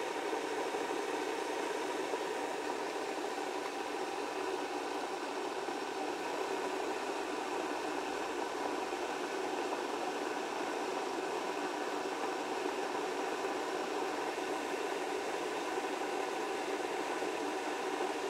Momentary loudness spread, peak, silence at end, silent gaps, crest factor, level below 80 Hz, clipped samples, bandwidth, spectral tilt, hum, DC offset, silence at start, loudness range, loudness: 2 LU; -22 dBFS; 0 s; none; 16 dB; -78 dBFS; under 0.1%; 16 kHz; -2.5 dB/octave; none; under 0.1%; 0 s; 1 LU; -37 LUFS